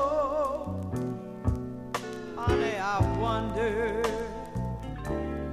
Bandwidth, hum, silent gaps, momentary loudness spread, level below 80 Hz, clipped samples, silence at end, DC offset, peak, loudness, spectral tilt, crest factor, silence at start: 14.5 kHz; none; none; 8 LU; -40 dBFS; under 0.1%; 0 s; under 0.1%; -12 dBFS; -31 LUFS; -6.5 dB/octave; 16 dB; 0 s